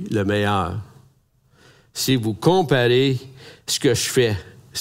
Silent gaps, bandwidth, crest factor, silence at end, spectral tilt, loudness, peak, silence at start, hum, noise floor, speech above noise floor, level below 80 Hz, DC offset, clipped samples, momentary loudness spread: none; 16 kHz; 20 dB; 0 s; -4.5 dB/octave; -20 LUFS; -2 dBFS; 0 s; none; -59 dBFS; 40 dB; -54 dBFS; under 0.1%; under 0.1%; 14 LU